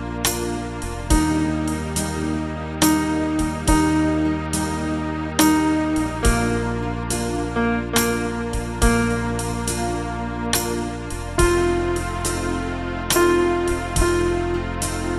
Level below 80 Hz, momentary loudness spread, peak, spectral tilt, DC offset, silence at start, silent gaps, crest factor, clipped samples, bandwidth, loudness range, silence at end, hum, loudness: -30 dBFS; 8 LU; -2 dBFS; -4.5 dB/octave; under 0.1%; 0 s; none; 18 dB; under 0.1%; 15.5 kHz; 2 LU; 0 s; none; -21 LUFS